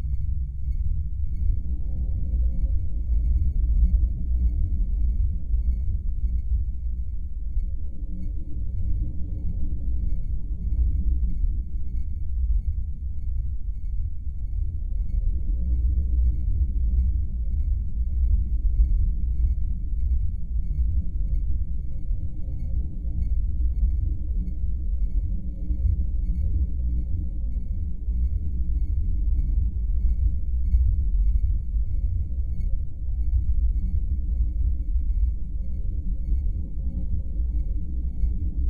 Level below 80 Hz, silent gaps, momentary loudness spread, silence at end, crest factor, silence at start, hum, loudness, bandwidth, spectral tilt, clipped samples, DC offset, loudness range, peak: -24 dBFS; none; 7 LU; 0 s; 14 dB; 0 s; none; -28 LUFS; 0.7 kHz; -11.5 dB/octave; under 0.1%; under 0.1%; 4 LU; -10 dBFS